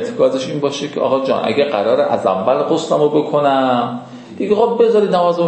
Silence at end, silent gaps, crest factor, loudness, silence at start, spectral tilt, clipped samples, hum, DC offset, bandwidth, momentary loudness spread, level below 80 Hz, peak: 0 s; none; 14 dB; -15 LUFS; 0 s; -6 dB/octave; under 0.1%; none; under 0.1%; 8.6 kHz; 7 LU; -62 dBFS; -2 dBFS